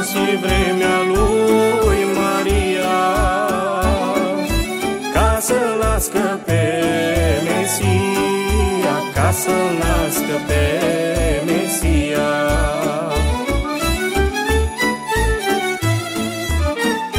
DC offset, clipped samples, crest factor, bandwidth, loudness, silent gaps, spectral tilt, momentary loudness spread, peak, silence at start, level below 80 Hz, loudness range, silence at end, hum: under 0.1%; under 0.1%; 14 dB; 16 kHz; -17 LUFS; none; -4.5 dB/octave; 4 LU; -2 dBFS; 0 s; -26 dBFS; 2 LU; 0 s; none